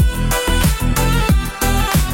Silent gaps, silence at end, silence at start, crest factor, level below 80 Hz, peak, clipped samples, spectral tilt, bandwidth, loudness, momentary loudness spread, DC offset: none; 0 s; 0 s; 12 dB; -18 dBFS; -4 dBFS; under 0.1%; -4.5 dB/octave; 17 kHz; -17 LUFS; 2 LU; under 0.1%